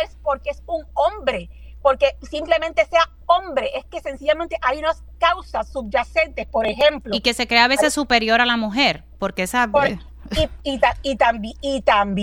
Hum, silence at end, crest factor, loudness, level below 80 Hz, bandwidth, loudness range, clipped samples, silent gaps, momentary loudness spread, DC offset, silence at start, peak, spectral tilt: none; 0 s; 20 dB; -20 LUFS; -38 dBFS; 19 kHz; 4 LU; under 0.1%; none; 10 LU; under 0.1%; 0 s; 0 dBFS; -3.5 dB/octave